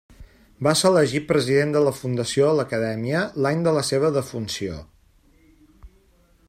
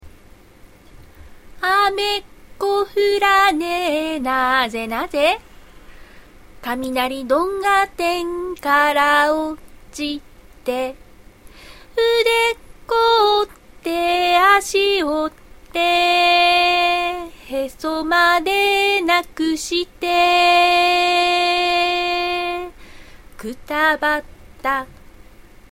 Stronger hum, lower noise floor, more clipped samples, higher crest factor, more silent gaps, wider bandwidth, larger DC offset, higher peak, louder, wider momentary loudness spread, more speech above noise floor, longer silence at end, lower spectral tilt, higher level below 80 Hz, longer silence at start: neither; first, -58 dBFS vs -46 dBFS; neither; about the same, 18 dB vs 18 dB; neither; about the same, 16 kHz vs 16.5 kHz; second, under 0.1% vs 0.1%; second, -6 dBFS vs 0 dBFS; second, -22 LUFS vs -17 LUFS; second, 10 LU vs 14 LU; first, 37 dB vs 29 dB; second, 0.6 s vs 0.75 s; first, -5 dB/octave vs -2 dB/octave; second, -54 dBFS vs -46 dBFS; first, 0.2 s vs 0.05 s